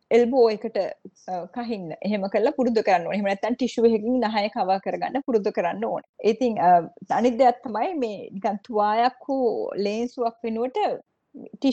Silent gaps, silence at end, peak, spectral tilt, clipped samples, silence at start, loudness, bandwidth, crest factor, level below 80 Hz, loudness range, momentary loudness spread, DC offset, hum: 6.09-6.14 s; 0 s; -8 dBFS; -6 dB/octave; under 0.1%; 0.1 s; -24 LUFS; 8.2 kHz; 16 dB; -64 dBFS; 3 LU; 11 LU; under 0.1%; none